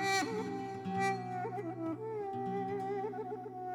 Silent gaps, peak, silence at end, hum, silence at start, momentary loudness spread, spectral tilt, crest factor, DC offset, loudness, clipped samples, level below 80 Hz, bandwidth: none; -22 dBFS; 0 s; none; 0 s; 6 LU; -4.5 dB/octave; 16 dB; under 0.1%; -38 LUFS; under 0.1%; -76 dBFS; 18 kHz